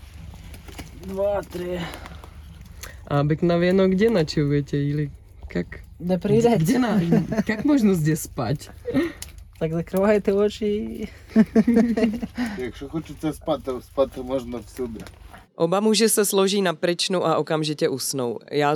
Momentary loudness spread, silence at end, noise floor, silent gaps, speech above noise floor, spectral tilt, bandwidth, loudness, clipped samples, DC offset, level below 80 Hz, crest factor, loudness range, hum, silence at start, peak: 20 LU; 0 s; -41 dBFS; none; 19 dB; -5.5 dB/octave; 19 kHz; -22 LUFS; under 0.1%; under 0.1%; -46 dBFS; 16 dB; 5 LU; none; 0 s; -6 dBFS